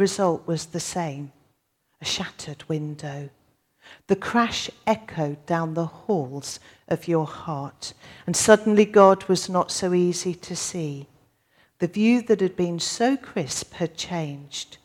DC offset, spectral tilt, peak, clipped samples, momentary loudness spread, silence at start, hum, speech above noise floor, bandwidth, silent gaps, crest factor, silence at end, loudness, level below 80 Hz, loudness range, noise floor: under 0.1%; -4.5 dB/octave; -2 dBFS; under 0.1%; 17 LU; 0 s; none; 47 dB; 17 kHz; none; 24 dB; 0.1 s; -24 LUFS; -62 dBFS; 9 LU; -71 dBFS